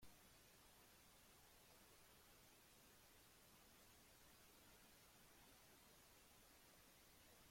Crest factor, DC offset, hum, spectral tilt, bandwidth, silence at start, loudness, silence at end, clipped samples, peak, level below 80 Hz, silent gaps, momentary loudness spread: 16 dB; under 0.1%; none; -2.5 dB/octave; 16.5 kHz; 0 s; -69 LUFS; 0 s; under 0.1%; -52 dBFS; -82 dBFS; none; 1 LU